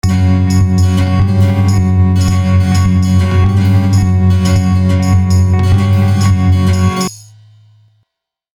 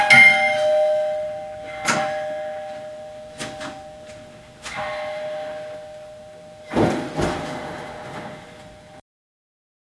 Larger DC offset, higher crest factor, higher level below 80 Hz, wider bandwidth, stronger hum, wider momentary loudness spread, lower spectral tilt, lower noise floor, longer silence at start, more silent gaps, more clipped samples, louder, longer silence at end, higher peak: neither; second, 10 dB vs 24 dB; first, -28 dBFS vs -52 dBFS; about the same, 12 kHz vs 12 kHz; neither; second, 1 LU vs 22 LU; first, -7 dB/octave vs -3.5 dB/octave; first, -76 dBFS vs -43 dBFS; about the same, 0.05 s vs 0 s; neither; neither; first, -11 LUFS vs -20 LUFS; first, 1.35 s vs 1 s; about the same, 0 dBFS vs 0 dBFS